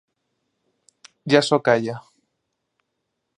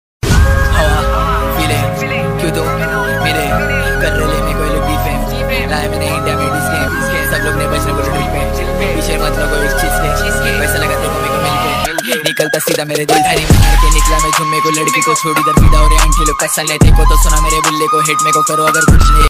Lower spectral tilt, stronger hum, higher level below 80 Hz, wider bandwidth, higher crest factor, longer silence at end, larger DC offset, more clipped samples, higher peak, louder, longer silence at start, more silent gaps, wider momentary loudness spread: about the same, -5 dB/octave vs -4 dB/octave; neither; second, -70 dBFS vs -16 dBFS; second, 11 kHz vs 16 kHz; first, 24 dB vs 12 dB; first, 1.4 s vs 0 s; neither; neither; about the same, -2 dBFS vs 0 dBFS; second, -19 LUFS vs -12 LUFS; first, 1.25 s vs 0.25 s; neither; first, 20 LU vs 6 LU